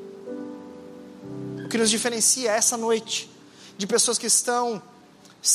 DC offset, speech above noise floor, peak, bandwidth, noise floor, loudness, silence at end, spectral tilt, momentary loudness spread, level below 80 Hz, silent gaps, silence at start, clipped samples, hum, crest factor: under 0.1%; 28 dB; -6 dBFS; 15 kHz; -51 dBFS; -22 LUFS; 0 s; -1.5 dB/octave; 22 LU; -74 dBFS; none; 0 s; under 0.1%; none; 20 dB